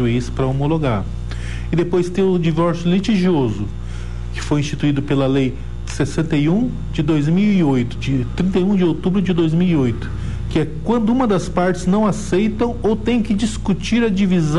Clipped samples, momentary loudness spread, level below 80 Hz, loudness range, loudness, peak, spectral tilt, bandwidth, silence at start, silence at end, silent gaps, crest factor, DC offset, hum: under 0.1%; 10 LU; -32 dBFS; 2 LU; -18 LUFS; -4 dBFS; -7 dB/octave; 11.5 kHz; 0 s; 0 s; none; 12 dB; 3%; 60 Hz at -30 dBFS